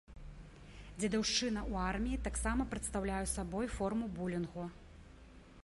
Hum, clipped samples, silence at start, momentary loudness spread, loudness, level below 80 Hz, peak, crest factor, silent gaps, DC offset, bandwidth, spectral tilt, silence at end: none; under 0.1%; 0.1 s; 22 LU; -37 LUFS; -48 dBFS; -22 dBFS; 18 dB; none; under 0.1%; 11.5 kHz; -4 dB/octave; 0.05 s